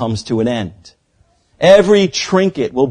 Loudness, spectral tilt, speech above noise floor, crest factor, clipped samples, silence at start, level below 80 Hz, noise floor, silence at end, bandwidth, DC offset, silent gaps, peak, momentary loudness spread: -13 LUFS; -5 dB/octave; 44 dB; 14 dB; 0.2%; 0 s; -48 dBFS; -57 dBFS; 0 s; 10.5 kHz; under 0.1%; none; 0 dBFS; 10 LU